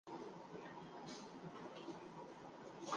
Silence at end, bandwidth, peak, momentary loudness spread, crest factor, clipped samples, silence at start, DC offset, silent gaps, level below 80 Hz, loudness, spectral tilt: 0 s; 9.6 kHz; -30 dBFS; 3 LU; 22 dB; under 0.1%; 0.05 s; under 0.1%; none; -84 dBFS; -54 LUFS; -4.5 dB/octave